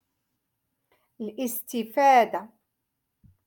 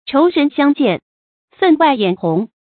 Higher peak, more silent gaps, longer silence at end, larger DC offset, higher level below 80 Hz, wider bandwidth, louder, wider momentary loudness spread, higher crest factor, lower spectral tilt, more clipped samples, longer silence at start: second, -8 dBFS vs 0 dBFS; second, none vs 1.02-1.48 s; first, 1 s vs 0.3 s; neither; second, -76 dBFS vs -62 dBFS; first, 17.5 kHz vs 4.6 kHz; second, -24 LUFS vs -15 LUFS; first, 18 LU vs 7 LU; first, 20 dB vs 14 dB; second, -3.5 dB/octave vs -11.5 dB/octave; neither; first, 1.2 s vs 0.05 s